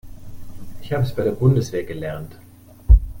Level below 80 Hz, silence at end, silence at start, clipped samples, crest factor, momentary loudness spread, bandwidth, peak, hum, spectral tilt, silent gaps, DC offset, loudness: -22 dBFS; 0 s; 0.05 s; under 0.1%; 18 dB; 24 LU; 16.5 kHz; -2 dBFS; none; -8 dB/octave; none; under 0.1%; -21 LUFS